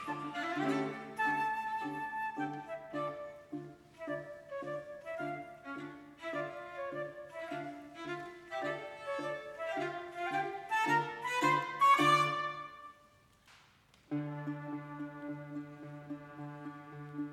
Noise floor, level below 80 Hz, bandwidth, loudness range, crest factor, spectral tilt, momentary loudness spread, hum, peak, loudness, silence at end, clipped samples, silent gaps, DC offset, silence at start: -65 dBFS; -76 dBFS; 16 kHz; 13 LU; 22 dB; -5 dB/octave; 16 LU; none; -16 dBFS; -37 LUFS; 0 s; under 0.1%; none; under 0.1%; 0 s